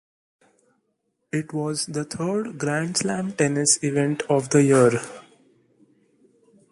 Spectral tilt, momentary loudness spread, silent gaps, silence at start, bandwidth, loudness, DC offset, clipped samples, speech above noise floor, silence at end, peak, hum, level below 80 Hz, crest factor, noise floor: -4.5 dB/octave; 10 LU; none; 1.35 s; 11.5 kHz; -22 LUFS; under 0.1%; under 0.1%; 52 dB; 1.5 s; -4 dBFS; none; -64 dBFS; 20 dB; -74 dBFS